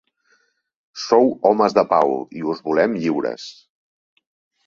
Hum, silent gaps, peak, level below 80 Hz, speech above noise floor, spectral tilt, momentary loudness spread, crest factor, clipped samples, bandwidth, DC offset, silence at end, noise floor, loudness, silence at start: none; none; -2 dBFS; -64 dBFS; 45 dB; -5.5 dB/octave; 16 LU; 18 dB; under 0.1%; 7.4 kHz; under 0.1%; 1.15 s; -63 dBFS; -19 LUFS; 0.95 s